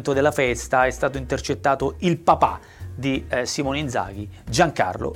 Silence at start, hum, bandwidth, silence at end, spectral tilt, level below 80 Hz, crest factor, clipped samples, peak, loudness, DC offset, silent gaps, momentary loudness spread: 0 s; none; 17.5 kHz; 0 s; -5 dB/octave; -42 dBFS; 18 dB; under 0.1%; -4 dBFS; -22 LUFS; under 0.1%; none; 9 LU